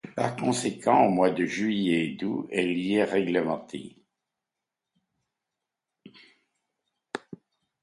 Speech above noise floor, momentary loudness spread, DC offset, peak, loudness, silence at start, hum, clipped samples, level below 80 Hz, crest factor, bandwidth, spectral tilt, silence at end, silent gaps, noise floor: 62 dB; 17 LU; under 0.1%; -8 dBFS; -26 LUFS; 0.05 s; none; under 0.1%; -70 dBFS; 22 dB; 11.5 kHz; -5.5 dB/octave; 0.5 s; none; -87 dBFS